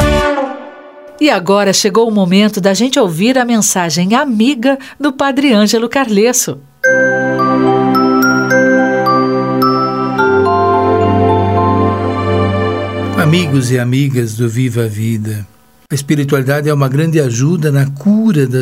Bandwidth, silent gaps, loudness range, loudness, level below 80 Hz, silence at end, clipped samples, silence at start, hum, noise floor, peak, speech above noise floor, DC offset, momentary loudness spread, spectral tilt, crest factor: 16.5 kHz; none; 4 LU; -12 LUFS; -36 dBFS; 0 s; under 0.1%; 0 s; none; -34 dBFS; 0 dBFS; 22 dB; 0.1%; 6 LU; -5 dB/octave; 12 dB